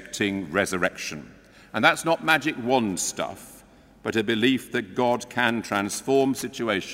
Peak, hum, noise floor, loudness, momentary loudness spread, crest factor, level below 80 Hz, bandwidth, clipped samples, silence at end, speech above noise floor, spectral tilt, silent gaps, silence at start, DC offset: -4 dBFS; none; -51 dBFS; -24 LUFS; 12 LU; 22 dB; -60 dBFS; 16 kHz; under 0.1%; 0 s; 27 dB; -3.5 dB/octave; none; 0 s; under 0.1%